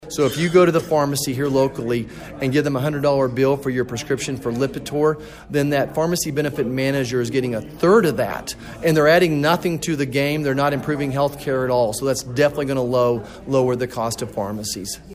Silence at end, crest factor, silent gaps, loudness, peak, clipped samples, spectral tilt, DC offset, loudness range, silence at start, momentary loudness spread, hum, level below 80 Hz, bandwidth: 0 s; 18 dB; none; -20 LUFS; -2 dBFS; under 0.1%; -5.5 dB/octave; under 0.1%; 3 LU; 0 s; 10 LU; none; -48 dBFS; 15.5 kHz